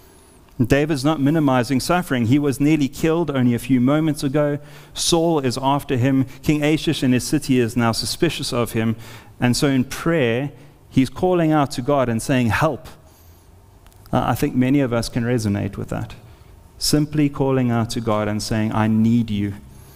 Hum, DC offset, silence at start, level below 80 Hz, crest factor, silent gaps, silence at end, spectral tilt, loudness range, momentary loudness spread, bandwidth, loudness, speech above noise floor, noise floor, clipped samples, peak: none; under 0.1%; 0.6 s; -42 dBFS; 18 dB; none; 0.2 s; -5.5 dB/octave; 3 LU; 7 LU; 16 kHz; -20 LUFS; 29 dB; -48 dBFS; under 0.1%; -2 dBFS